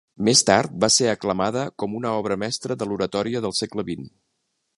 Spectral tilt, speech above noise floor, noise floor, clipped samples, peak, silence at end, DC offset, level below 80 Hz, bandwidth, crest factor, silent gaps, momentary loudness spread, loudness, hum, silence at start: -3 dB/octave; 52 dB; -75 dBFS; under 0.1%; 0 dBFS; 0.7 s; under 0.1%; -56 dBFS; 11.5 kHz; 22 dB; none; 11 LU; -22 LUFS; none; 0.2 s